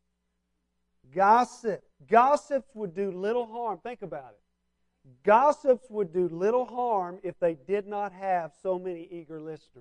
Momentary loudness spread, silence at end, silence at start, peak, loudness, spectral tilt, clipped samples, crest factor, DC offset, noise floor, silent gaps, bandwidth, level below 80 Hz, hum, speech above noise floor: 18 LU; 0 s; 1.15 s; -8 dBFS; -27 LUFS; -6 dB/octave; under 0.1%; 20 dB; under 0.1%; -78 dBFS; none; 11 kHz; -70 dBFS; none; 51 dB